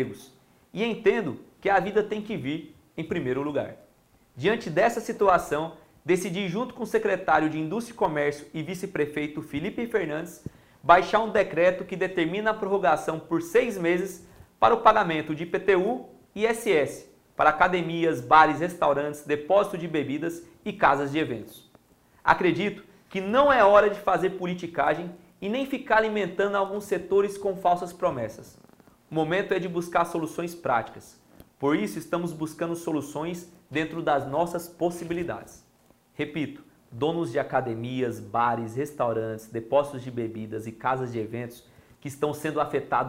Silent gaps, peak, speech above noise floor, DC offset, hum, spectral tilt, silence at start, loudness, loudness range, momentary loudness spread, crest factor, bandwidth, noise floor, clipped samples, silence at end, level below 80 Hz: none; -2 dBFS; 36 dB; under 0.1%; none; -5.5 dB/octave; 0 s; -26 LUFS; 7 LU; 13 LU; 24 dB; 16 kHz; -61 dBFS; under 0.1%; 0 s; -58 dBFS